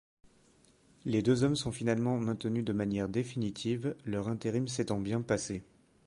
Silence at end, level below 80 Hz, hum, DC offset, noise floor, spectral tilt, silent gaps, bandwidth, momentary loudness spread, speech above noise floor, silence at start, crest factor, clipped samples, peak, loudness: 0.45 s; -60 dBFS; none; under 0.1%; -65 dBFS; -6 dB/octave; none; 11.5 kHz; 7 LU; 33 dB; 1.05 s; 18 dB; under 0.1%; -16 dBFS; -33 LUFS